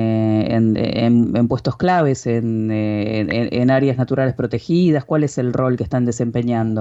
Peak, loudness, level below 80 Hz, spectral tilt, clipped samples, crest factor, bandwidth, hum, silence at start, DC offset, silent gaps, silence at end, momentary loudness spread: -6 dBFS; -18 LUFS; -48 dBFS; -7.5 dB/octave; under 0.1%; 12 dB; 8 kHz; none; 0 s; under 0.1%; none; 0 s; 4 LU